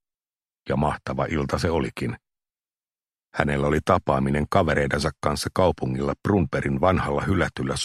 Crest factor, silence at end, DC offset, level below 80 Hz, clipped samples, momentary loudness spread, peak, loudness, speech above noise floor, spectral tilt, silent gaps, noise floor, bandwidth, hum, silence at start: 22 dB; 0 s; under 0.1%; -40 dBFS; under 0.1%; 7 LU; -2 dBFS; -24 LUFS; over 67 dB; -6 dB/octave; none; under -90 dBFS; 13.5 kHz; none; 0.65 s